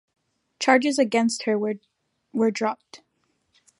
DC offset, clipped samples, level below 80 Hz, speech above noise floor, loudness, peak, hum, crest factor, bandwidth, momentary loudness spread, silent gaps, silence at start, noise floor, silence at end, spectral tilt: under 0.1%; under 0.1%; -80 dBFS; 49 dB; -23 LUFS; -2 dBFS; none; 22 dB; 11.5 kHz; 13 LU; none; 0.6 s; -72 dBFS; 0.85 s; -4 dB/octave